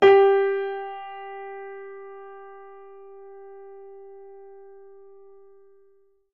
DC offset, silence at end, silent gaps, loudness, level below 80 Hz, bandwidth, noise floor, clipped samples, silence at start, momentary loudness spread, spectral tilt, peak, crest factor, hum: 0.3%; 4 s; none; -23 LUFS; -72 dBFS; 5.6 kHz; -61 dBFS; under 0.1%; 0 s; 26 LU; -5.5 dB/octave; -4 dBFS; 22 dB; none